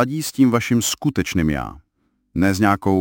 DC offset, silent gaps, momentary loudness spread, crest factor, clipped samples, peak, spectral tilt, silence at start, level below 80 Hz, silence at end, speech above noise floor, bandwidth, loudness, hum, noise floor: under 0.1%; none; 9 LU; 18 dB; under 0.1%; -2 dBFS; -5 dB/octave; 0 s; -40 dBFS; 0 s; 49 dB; 17 kHz; -19 LUFS; none; -67 dBFS